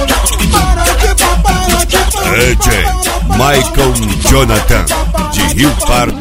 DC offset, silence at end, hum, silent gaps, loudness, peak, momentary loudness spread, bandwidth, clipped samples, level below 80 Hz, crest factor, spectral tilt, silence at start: under 0.1%; 0 s; none; none; -10 LUFS; 0 dBFS; 3 LU; 16.5 kHz; 0.4%; -14 dBFS; 10 dB; -3.5 dB/octave; 0 s